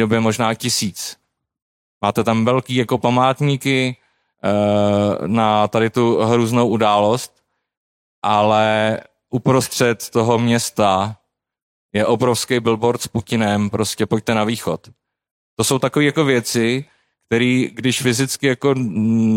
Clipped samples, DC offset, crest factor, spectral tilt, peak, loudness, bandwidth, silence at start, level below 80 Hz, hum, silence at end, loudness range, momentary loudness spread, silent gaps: under 0.1%; under 0.1%; 16 dB; -5 dB/octave; -2 dBFS; -18 LUFS; 16.5 kHz; 0 s; -56 dBFS; none; 0 s; 2 LU; 8 LU; 1.62-2.01 s, 7.77-8.22 s, 11.62-11.89 s, 15.31-15.57 s